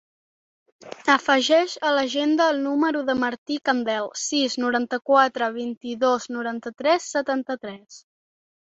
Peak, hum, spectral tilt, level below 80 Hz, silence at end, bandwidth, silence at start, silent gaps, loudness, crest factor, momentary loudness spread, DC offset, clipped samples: -4 dBFS; none; -2 dB/octave; -68 dBFS; 0.7 s; 8.2 kHz; 0.85 s; 3.38-3.46 s, 5.77-5.81 s; -22 LUFS; 20 dB; 12 LU; under 0.1%; under 0.1%